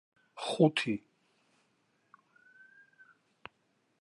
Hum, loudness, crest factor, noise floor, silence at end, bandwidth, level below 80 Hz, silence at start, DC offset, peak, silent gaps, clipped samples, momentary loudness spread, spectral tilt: none; -31 LUFS; 26 dB; -75 dBFS; 3.05 s; 11.5 kHz; -80 dBFS; 0.35 s; under 0.1%; -12 dBFS; none; under 0.1%; 26 LU; -6 dB/octave